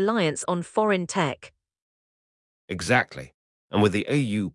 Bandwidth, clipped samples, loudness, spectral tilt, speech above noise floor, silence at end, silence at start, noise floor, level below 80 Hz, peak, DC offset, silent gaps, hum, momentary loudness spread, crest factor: 12 kHz; under 0.1%; -24 LUFS; -5 dB/octave; over 66 dB; 0.05 s; 0 s; under -90 dBFS; -62 dBFS; -6 dBFS; under 0.1%; 1.82-2.68 s, 3.34-3.68 s; none; 11 LU; 20 dB